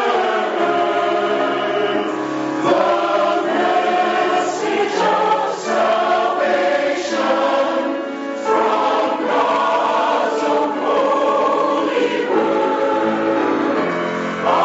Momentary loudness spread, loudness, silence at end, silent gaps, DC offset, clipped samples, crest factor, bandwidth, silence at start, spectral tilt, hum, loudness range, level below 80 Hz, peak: 4 LU; -17 LUFS; 0 s; none; under 0.1%; under 0.1%; 14 dB; 8 kHz; 0 s; -2 dB/octave; none; 1 LU; -66 dBFS; -2 dBFS